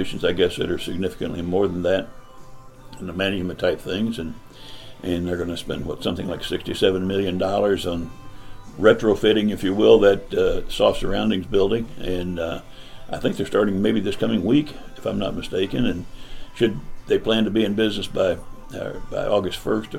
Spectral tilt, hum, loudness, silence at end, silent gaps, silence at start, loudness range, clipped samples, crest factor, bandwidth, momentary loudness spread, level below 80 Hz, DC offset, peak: -6 dB/octave; none; -22 LUFS; 0 s; none; 0 s; 7 LU; under 0.1%; 20 dB; 16 kHz; 14 LU; -38 dBFS; under 0.1%; -2 dBFS